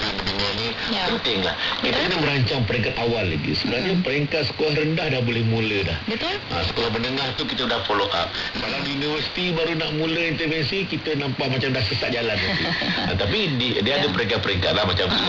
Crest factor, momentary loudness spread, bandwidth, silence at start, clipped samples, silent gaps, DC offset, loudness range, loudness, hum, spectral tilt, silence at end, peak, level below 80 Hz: 14 dB; 4 LU; 6 kHz; 0 s; under 0.1%; none; under 0.1%; 2 LU; -22 LUFS; none; -5.5 dB/octave; 0 s; -10 dBFS; -46 dBFS